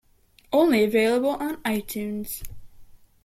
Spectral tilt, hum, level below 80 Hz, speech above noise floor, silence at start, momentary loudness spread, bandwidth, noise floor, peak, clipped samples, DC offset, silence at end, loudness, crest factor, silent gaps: -5 dB/octave; none; -50 dBFS; 36 dB; 0.5 s; 14 LU; 16.5 kHz; -58 dBFS; -8 dBFS; under 0.1%; under 0.1%; 0.4 s; -24 LUFS; 16 dB; none